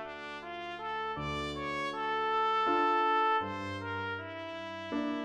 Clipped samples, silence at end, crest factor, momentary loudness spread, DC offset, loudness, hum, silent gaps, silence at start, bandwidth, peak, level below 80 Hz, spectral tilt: under 0.1%; 0 s; 16 dB; 13 LU; under 0.1%; -33 LUFS; none; none; 0 s; 11 kHz; -18 dBFS; -60 dBFS; -5.5 dB/octave